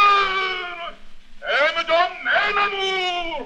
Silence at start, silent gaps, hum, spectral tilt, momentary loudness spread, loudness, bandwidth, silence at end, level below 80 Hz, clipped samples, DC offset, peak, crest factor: 0 s; none; none; -1.5 dB/octave; 13 LU; -20 LUFS; 9.8 kHz; 0 s; -46 dBFS; under 0.1%; under 0.1%; -4 dBFS; 16 dB